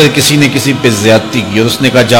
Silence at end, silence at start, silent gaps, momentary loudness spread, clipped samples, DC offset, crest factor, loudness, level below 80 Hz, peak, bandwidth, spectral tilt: 0 s; 0 s; none; 4 LU; 1%; under 0.1%; 8 dB; -8 LUFS; -42 dBFS; 0 dBFS; over 20 kHz; -4.5 dB/octave